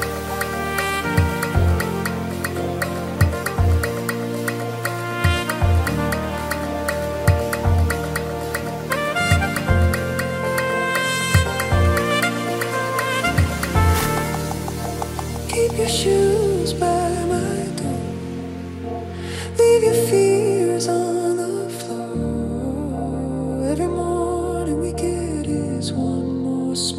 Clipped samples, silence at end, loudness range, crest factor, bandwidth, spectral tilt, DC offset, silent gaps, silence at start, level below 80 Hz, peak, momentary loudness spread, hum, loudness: under 0.1%; 0 s; 4 LU; 18 dB; 16 kHz; -5.5 dB/octave; under 0.1%; none; 0 s; -32 dBFS; -2 dBFS; 8 LU; none; -21 LUFS